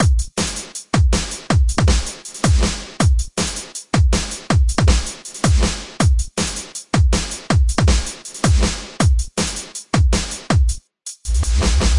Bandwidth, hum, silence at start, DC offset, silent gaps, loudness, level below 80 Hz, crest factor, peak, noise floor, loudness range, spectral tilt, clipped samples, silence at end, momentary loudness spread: 11.5 kHz; none; 0 s; under 0.1%; none; -19 LUFS; -20 dBFS; 16 dB; -2 dBFS; -36 dBFS; 1 LU; -4.5 dB/octave; under 0.1%; 0 s; 6 LU